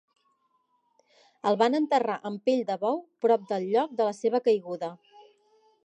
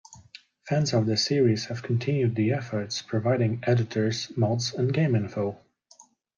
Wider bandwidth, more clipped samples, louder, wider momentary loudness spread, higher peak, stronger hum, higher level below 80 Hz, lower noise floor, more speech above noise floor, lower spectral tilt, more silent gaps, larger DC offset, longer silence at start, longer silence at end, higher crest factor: first, 9 kHz vs 7.4 kHz; neither; about the same, -27 LUFS vs -26 LUFS; about the same, 7 LU vs 7 LU; about the same, -10 dBFS vs -12 dBFS; neither; second, -86 dBFS vs -66 dBFS; first, -72 dBFS vs -57 dBFS; first, 46 dB vs 32 dB; about the same, -6 dB/octave vs -6 dB/octave; neither; neither; first, 1.45 s vs 0.1 s; first, 0.9 s vs 0.35 s; about the same, 18 dB vs 16 dB